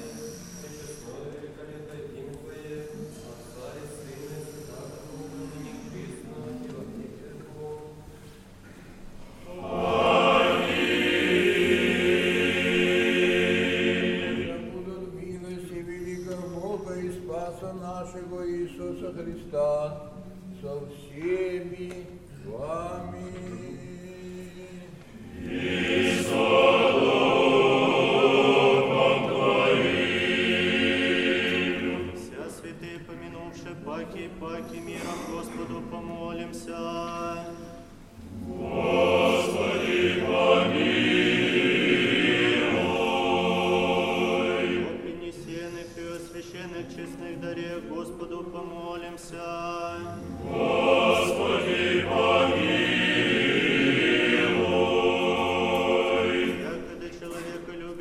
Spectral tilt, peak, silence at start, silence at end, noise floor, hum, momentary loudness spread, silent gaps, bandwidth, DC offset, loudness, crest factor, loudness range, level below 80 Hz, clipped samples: -5 dB/octave; -8 dBFS; 0 s; 0 s; -47 dBFS; none; 19 LU; none; 14.5 kHz; under 0.1%; -24 LUFS; 20 dB; 18 LU; -54 dBFS; under 0.1%